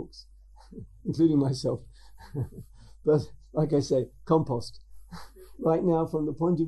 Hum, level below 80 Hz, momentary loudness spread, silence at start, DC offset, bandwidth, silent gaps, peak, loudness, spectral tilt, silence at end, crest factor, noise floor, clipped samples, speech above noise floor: none; -52 dBFS; 23 LU; 0 s; under 0.1%; 12.5 kHz; none; -10 dBFS; -28 LUFS; -8 dB/octave; 0 s; 18 dB; -47 dBFS; under 0.1%; 20 dB